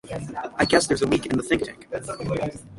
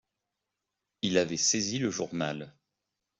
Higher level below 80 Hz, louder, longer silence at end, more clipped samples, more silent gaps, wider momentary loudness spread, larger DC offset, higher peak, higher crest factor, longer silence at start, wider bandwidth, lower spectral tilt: first, -48 dBFS vs -70 dBFS; first, -24 LUFS vs -29 LUFS; second, 0 s vs 0.7 s; neither; neither; about the same, 13 LU vs 11 LU; neither; first, -4 dBFS vs -12 dBFS; about the same, 22 dB vs 22 dB; second, 0.05 s vs 1.05 s; first, 11.5 kHz vs 8.2 kHz; first, -4.5 dB/octave vs -3 dB/octave